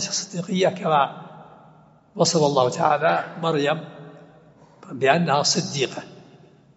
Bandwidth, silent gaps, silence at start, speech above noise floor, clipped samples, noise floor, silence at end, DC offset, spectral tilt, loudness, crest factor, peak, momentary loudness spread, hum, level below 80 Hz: 8 kHz; none; 0 s; 31 dB; under 0.1%; -52 dBFS; 0.55 s; under 0.1%; -3.5 dB/octave; -21 LUFS; 20 dB; -2 dBFS; 21 LU; none; -70 dBFS